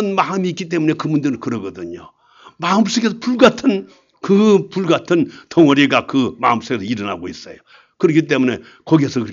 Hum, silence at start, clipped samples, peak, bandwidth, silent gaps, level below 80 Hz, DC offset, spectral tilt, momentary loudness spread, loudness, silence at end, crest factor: none; 0 s; under 0.1%; 0 dBFS; 7.6 kHz; none; -58 dBFS; under 0.1%; -6 dB/octave; 15 LU; -16 LUFS; 0 s; 16 dB